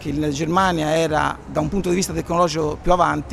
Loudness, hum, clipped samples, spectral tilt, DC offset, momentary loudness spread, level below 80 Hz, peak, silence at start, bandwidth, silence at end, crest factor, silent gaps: -20 LUFS; none; under 0.1%; -5 dB/octave; under 0.1%; 5 LU; -34 dBFS; -2 dBFS; 0 s; 14.5 kHz; 0 s; 18 dB; none